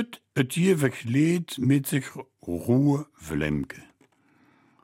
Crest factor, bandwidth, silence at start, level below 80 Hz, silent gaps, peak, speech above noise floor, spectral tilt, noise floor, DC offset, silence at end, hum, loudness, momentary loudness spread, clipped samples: 18 dB; 16.5 kHz; 0 s; -52 dBFS; none; -8 dBFS; 38 dB; -6.5 dB/octave; -63 dBFS; under 0.1%; 1.05 s; none; -25 LUFS; 13 LU; under 0.1%